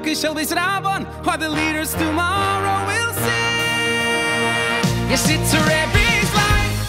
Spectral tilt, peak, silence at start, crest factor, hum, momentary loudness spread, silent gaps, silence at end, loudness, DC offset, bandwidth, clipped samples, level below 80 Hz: -3.5 dB/octave; -4 dBFS; 0 s; 14 dB; none; 5 LU; none; 0 s; -18 LUFS; under 0.1%; 16 kHz; under 0.1%; -32 dBFS